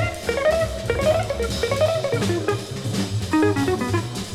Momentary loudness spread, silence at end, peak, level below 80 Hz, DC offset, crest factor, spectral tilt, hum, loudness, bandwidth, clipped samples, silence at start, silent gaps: 5 LU; 0 s; -8 dBFS; -38 dBFS; under 0.1%; 14 dB; -5.5 dB/octave; none; -22 LUFS; 15.5 kHz; under 0.1%; 0 s; none